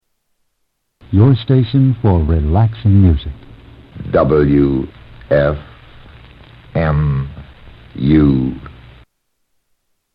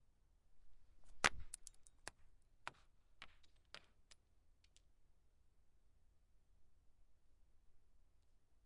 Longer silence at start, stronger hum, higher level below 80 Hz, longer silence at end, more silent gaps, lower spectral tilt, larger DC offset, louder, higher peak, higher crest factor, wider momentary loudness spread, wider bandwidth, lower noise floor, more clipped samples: first, 1.1 s vs 0 s; neither; first, -28 dBFS vs -68 dBFS; first, 1.45 s vs 0.1 s; neither; first, -11.5 dB/octave vs -1 dB/octave; neither; first, -14 LUFS vs -44 LUFS; first, 0 dBFS vs -18 dBFS; second, 14 dB vs 36 dB; second, 15 LU vs 23 LU; second, 5 kHz vs 11 kHz; second, -68 dBFS vs -72 dBFS; neither